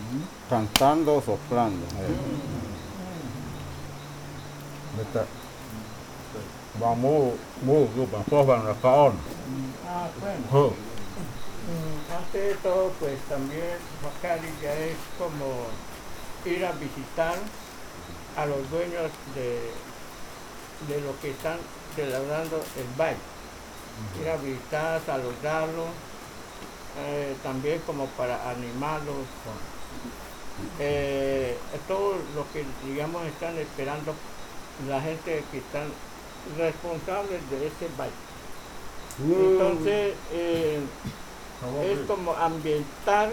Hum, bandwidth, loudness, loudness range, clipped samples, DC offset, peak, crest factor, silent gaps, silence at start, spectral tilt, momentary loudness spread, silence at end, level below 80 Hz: none; over 20 kHz; -29 LUFS; 9 LU; under 0.1%; under 0.1%; -2 dBFS; 28 dB; none; 0 s; -5.5 dB/octave; 18 LU; 0 s; -50 dBFS